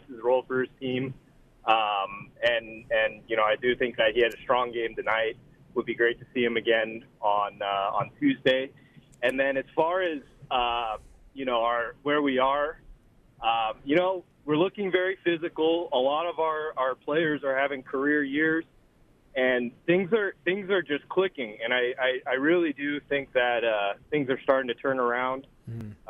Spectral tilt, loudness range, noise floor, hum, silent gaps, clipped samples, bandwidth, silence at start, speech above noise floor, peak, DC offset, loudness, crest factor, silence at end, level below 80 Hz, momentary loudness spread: -6.5 dB/octave; 2 LU; -60 dBFS; none; none; under 0.1%; 11.5 kHz; 0.1 s; 33 dB; -8 dBFS; under 0.1%; -27 LUFS; 20 dB; 0.15 s; -60 dBFS; 7 LU